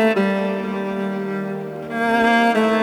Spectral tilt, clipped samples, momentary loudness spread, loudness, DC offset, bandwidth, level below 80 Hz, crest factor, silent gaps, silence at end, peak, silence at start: -6 dB/octave; under 0.1%; 11 LU; -20 LUFS; under 0.1%; 19 kHz; -58 dBFS; 14 dB; none; 0 s; -6 dBFS; 0 s